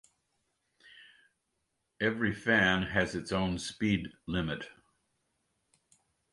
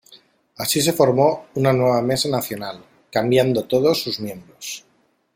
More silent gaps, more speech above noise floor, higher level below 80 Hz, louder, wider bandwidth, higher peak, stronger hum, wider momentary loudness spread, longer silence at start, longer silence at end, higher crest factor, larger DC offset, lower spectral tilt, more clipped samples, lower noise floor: neither; first, 50 dB vs 32 dB; about the same, -56 dBFS vs -58 dBFS; second, -31 LUFS vs -19 LUFS; second, 11.5 kHz vs 16.5 kHz; second, -12 dBFS vs -2 dBFS; neither; second, 11 LU vs 16 LU; first, 0.95 s vs 0.1 s; first, 1.6 s vs 0.55 s; about the same, 22 dB vs 18 dB; neither; about the same, -5 dB/octave vs -4.5 dB/octave; neither; first, -81 dBFS vs -52 dBFS